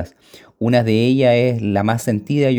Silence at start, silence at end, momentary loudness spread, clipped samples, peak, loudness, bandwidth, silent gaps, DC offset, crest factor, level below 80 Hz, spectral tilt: 0 s; 0 s; 7 LU; under 0.1%; -2 dBFS; -17 LUFS; over 20 kHz; none; under 0.1%; 14 dB; -54 dBFS; -7 dB/octave